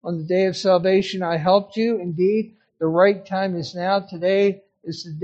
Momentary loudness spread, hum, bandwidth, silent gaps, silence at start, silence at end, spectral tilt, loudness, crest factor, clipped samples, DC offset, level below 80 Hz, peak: 10 LU; none; 8.2 kHz; none; 0.05 s; 0 s; -6.5 dB/octave; -20 LUFS; 18 dB; under 0.1%; under 0.1%; -64 dBFS; -2 dBFS